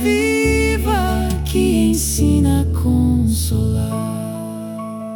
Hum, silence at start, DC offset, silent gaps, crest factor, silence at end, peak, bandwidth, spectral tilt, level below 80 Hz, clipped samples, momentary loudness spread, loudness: none; 0 s; under 0.1%; none; 12 dB; 0 s; -4 dBFS; 17.5 kHz; -5.5 dB/octave; -26 dBFS; under 0.1%; 11 LU; -17 LUFS